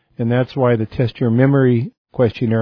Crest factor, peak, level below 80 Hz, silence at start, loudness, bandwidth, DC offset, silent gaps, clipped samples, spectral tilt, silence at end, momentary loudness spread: 16 dB; -2 dBFS; -50 dBFS; 0.2 s; -17 LUFS; 5.4 kHz; under 0.1%; 1.98-2.05 s; under 0.1%; -10.5 dB/octave; 0 s; 7 LU